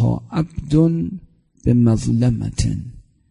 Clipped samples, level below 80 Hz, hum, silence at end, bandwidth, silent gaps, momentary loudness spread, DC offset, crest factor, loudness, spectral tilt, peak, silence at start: under 0.1%; -34 dBFS; none; 0.3 s; 11 kHz; none; 13 LU; under 0.1%; 16 dB; -19 LUFS; -8 dB/octave; -2 dBFS; 0 s